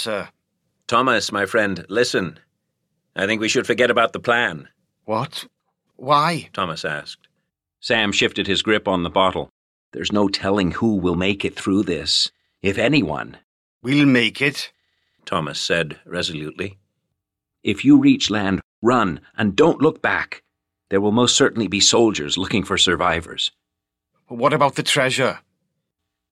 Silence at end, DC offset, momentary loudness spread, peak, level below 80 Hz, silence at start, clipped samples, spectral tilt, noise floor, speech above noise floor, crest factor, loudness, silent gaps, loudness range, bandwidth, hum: 0.95 s; under 0.1%; 14 LU; -4 dBFS; -52 dBFS; 0 s; under 0.1%; -4 dB/octave; -82 dBFS; 62 dB; 18 dB; -19 LUFS; 9.50-9.92 s, 13.44-13.81 s, 18.63-18.82 s; 4 LU; 13.5 kHz; none